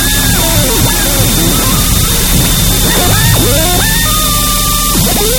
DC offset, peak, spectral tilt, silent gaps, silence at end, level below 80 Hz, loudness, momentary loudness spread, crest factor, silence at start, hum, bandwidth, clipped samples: 0.3%; 0 dBFS; -3 dB/octave; none; 0 s; -16 dBFS; -8 LUFS; 1 LU; 10 dB; 0 s; none; 19.5 kHz; 0.3%